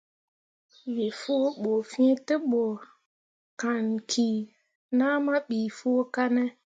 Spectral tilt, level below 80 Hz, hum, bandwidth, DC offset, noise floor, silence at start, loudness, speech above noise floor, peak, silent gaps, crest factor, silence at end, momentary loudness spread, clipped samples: -4.5 dB/octave; -80 dBFS; none; 9 kHz; under 0.1%; under -90 dBFS; 0.85 s; -27 LUFS; over 64 dB; -12 dBFS; 3.06-3.57 s, 4.75-4.89 s; 16 dB; 0.15 s; 9 LU; under 0.1%